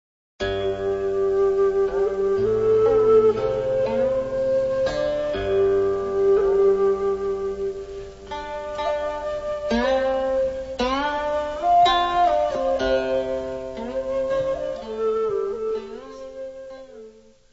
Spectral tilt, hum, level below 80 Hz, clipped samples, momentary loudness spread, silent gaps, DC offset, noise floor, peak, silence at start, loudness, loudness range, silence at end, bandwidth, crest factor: -5.5 dB/octave; none; -44 dBFS; under 0.1%; 13 LU; none; under 0.1%; -47 dBFS; -8 dBFS; 0.4 s; -22 LUFS; 6 LU; 0.45 s; 8 kHz; 14 dB